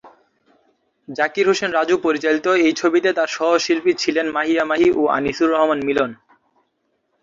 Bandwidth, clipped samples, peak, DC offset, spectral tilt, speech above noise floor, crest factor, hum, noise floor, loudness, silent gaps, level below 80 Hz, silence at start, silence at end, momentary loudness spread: 7.6 kHz; under 0.1%; -4 dBFS; under 0.1%; -4 dB/octave; 51 dB; 16 dB; none; -69 dBFS; -18 LUFS; none; -58 dBFS; 0.05 s; 1.1 s; 4 LU